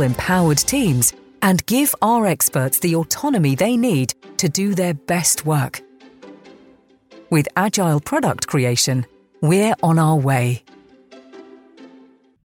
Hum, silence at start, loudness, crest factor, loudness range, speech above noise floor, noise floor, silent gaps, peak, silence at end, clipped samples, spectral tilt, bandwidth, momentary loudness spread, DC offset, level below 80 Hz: none; 0 s; -18 LUFS; 16 dB; 4 LU; 34 dB; -51 dBFS; none; -4 dBFS; 0.7 s; under 0.1%; -4.5 dB/octave; 17 kHz; 6 LU; under 0.1%; -50 dBFS